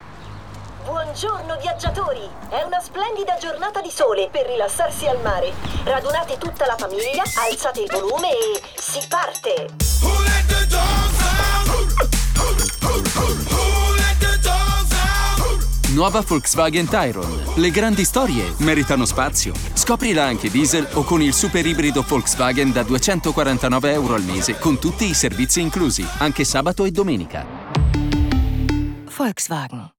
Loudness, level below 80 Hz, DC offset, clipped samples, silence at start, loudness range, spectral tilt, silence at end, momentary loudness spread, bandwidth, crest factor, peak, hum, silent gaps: -19 LUFS; -24 dBFS; under 0.1%; under 0.1%; 0 s; 4 LU; -4 dB/octave; 0.1 s; 8 LU; over 20 kHz; 16 dB; -4 dBFS; none; none